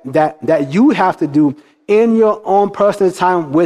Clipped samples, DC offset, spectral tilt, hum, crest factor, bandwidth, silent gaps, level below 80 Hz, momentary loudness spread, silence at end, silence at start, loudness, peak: under 0.1%; under 0.1%; -7 dB/octave; none; 12 dB; 12 kHz; none; -58 dBFS; 4 LU; 0 s; 0.05 s; -13 LUFS; 0 dBFS